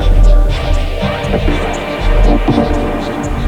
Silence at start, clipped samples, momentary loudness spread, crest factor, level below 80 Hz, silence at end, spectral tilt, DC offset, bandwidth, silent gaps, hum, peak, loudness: 0 s; under 0.1%; 6 LU; 10 dB; -12 dBFS; 0 s; -6.5 dB/octave; under 0.1%; 9 kHz; none; none; 0 dBFS; -15 LUFS